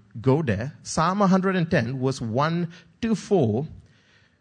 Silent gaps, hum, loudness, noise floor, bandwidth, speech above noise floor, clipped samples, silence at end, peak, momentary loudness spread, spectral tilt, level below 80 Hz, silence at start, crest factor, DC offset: none; none; -24 LUFS; -59 dBFS; 9.6 kHz; 36 dB; under 0.1%; 0.6 s; -6 dBFS; 9 LU; -6.5 dB/octave; -54 dBFS; 0.15 s; 18 dB; under 0.1%